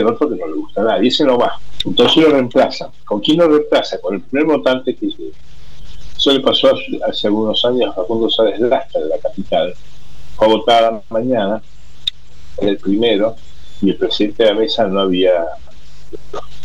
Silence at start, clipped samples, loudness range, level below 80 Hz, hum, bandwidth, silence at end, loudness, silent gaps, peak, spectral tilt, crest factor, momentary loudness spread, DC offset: 0 s; under 0.1%; 3 LU; -44 dBFS; none; 11.5 kHz; 0 s; -15 LUFS; none; -2 dBFS; -5.5 dB/octave; 14 dB; 11 LU; 5%